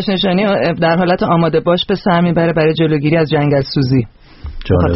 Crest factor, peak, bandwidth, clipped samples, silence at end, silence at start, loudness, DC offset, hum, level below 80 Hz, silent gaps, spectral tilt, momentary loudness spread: 12 dB; 0 dBFS; 5.8 kHz; under 0.1%; 0 s; 0 s; -13 LUFS; under 0.1%; none; -34 dBFS; none; -5.5 dB/octave; 4 LU